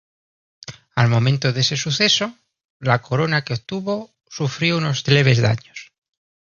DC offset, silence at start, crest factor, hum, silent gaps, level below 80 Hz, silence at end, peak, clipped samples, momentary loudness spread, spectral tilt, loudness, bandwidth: under 0.1%; 0.7 s; 20 dB; none; 2.64-2.80 s; -54 dBFS; 0.7 s; -2 dBFS; under 0.1%; 19 LU; -5 dB/octave; -19 LUFS; 7.2 kHz